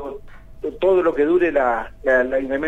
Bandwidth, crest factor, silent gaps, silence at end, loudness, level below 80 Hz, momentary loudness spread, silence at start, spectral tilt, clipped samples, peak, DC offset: 7.8 kHz; 14 dB; none; 0 s; -19 LUFS; -42 dBFS; 14 LU; 0 s; -7 dB/octave; under 0.1%; -6 dBFS; under 0.1%